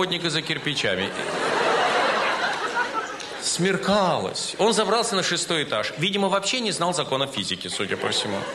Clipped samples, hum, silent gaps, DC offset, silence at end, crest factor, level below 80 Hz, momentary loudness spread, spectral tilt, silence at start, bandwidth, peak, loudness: under 0.1%; none; none; under 0.1%; 0 s; 16 dB; -62 dBFS; 6 LU; -3 dB/octave; 0 s; 13 kHz; -8 dBFS; -23 LUFS